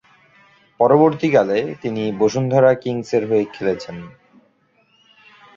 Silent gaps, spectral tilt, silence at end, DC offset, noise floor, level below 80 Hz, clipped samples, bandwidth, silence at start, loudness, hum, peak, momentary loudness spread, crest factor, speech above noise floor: none; -7 dB/octave; 1.45 s; under 0.1%; -60 dBFS; -58 dBFS; under 0.1%; 7.4 kHz; 0.8 s; -18 LUFS; none; -2 dBFS; 10 LU; 18 dB; 43 dB